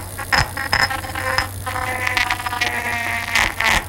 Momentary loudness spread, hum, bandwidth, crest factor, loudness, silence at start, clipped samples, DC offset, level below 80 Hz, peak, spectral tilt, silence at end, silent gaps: 6 LU; none; 17 kHz; 20 dB; -19 LUFS; 0 s; under 0.1%; under 0.1%; -36 dBFS; 0 dBFS; -2.5 dB/octave; 0 s; none